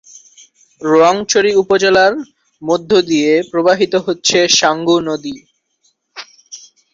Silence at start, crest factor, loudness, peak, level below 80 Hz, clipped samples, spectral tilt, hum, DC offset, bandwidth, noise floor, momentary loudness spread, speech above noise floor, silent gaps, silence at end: 0.8 s; 14 dB; -13 LUFS; 0 dBFS; -56 dBFS; under 0.1%; -3 dB/octave; none; under 0.1%; 7.8 kHz; -61 dBFS; 23 LU; 49 dB; none; 0.35 s